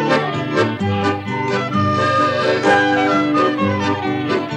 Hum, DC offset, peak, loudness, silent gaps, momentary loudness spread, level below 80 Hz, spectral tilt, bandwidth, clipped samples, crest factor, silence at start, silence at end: none; under 0.1%; -2 dBFS; -17 LUFS; none; 6 LU; -58 dBFS; -6 dB/octave; 9.6 kHz; under 0.1%; 14 dB; 0 s; 0 s